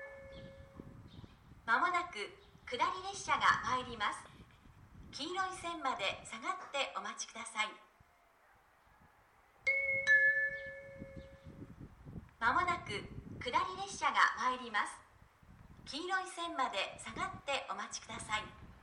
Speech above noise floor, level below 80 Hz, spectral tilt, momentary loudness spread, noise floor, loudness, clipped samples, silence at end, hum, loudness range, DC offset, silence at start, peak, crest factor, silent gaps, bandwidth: 31 dB; -64 dBFS; -2.5 dB/octave; 23 LU; -68 dBFS; -36 LUFS; under 0.1%; 0.05 s; none; 6 LU; under 0.1%; 0 s; -14 dBFS; 24 dB; none; 12 kHz